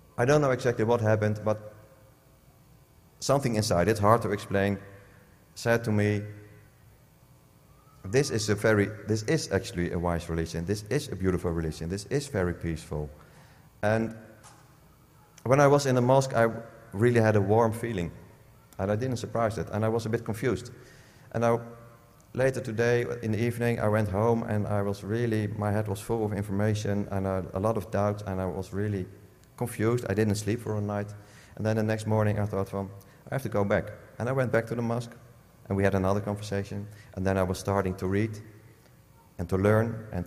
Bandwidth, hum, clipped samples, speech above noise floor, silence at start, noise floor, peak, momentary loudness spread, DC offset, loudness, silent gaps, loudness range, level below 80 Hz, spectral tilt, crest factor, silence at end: 15.5 kHz; none; under 0.1%; 31 dB; 0.2 s; -58 dBFS; -6 dBFS; 12 LU; under 0.1%; -28 LUFS; none; 5 LU; -56 dBFS; -6.5 dB/octave; 22 dB; 0 s